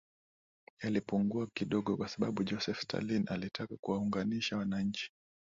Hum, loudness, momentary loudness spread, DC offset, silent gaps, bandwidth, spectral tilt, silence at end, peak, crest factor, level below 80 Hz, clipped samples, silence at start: none; -36 LUFS; 6 LU; under 0.1%; 3.79-3.83 s; 7.6 kHz; -6 dB/octave; 0.5 s; -20 dBFS; 16 dB; -66 dBFS; under 0.1%; 0.8 s